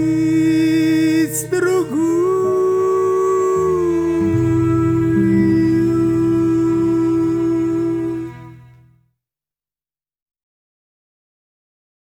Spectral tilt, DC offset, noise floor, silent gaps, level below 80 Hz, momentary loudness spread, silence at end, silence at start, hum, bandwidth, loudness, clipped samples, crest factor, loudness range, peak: -7 dB/octave; under 0.1%; under -90 dBFS; none; -44 dBFS; 3 LU; 3.6 s; 0 s; none; 16.5 kHz; -16 LUFS; under 0.1%; 12 dB; 8 LU; -4 dBFS